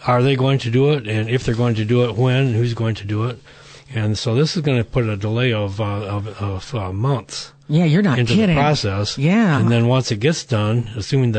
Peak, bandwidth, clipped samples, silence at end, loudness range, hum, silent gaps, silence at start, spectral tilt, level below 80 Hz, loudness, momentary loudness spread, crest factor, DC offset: -4 dBFS; 9 kHz; under 0.1%; 0 s; 4 LU; none; none; 0 s; -6.5 dB/octave; -44 dBFS; -18 LUFS; 9 LU; 14 dB; under 0.1%